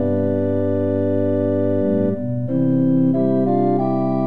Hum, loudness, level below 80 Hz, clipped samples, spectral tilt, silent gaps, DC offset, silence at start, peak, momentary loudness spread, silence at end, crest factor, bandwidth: none; -19 LUFS; -66 dBFS; under 0.1%; -12 dB/octave; none; 2%; 0 s; -6 dBFS; 3 LU; 0 s; 10 dB; 4.2 kHz